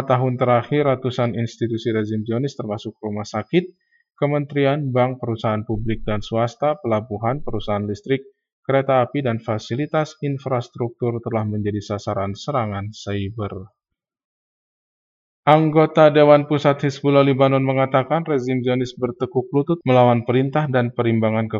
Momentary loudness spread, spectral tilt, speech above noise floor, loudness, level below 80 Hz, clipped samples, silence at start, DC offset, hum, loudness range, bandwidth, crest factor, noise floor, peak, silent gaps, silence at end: 11 LU; -7.5 dB/octave; over 71 dB; -20 LUFS; -48 dBFS; under 0.1%; 0 s; under 0.1%; none; 9 LU; 7.6 kHz; 20 dB; under -90 dBFS; 0 dBFS; 8.53-8.63 s, 14.24-15.43 s; 0 s